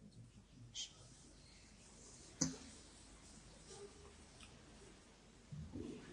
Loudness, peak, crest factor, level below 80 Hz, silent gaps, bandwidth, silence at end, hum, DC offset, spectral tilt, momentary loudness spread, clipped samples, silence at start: -52 LUFS; -20 dBFS; 34 dB; -68 dBFS; none; 10.5 kHz; 0 s; none; under 0.1%; -3 dB/octave; 20 LU; under 0.1%; 0 s